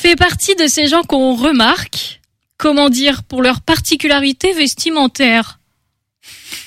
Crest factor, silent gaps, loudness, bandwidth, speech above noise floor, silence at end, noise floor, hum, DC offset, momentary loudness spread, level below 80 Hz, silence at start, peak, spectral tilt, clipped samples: 14 dB; none; -12 LUFS; 16 kHz; 55 dB; 0 s; -68 dBFS; none; under 0.1%; 7 LU; -38 dBFS; 0 s; 0 dBFS; -3 dB/octave; under 0.1%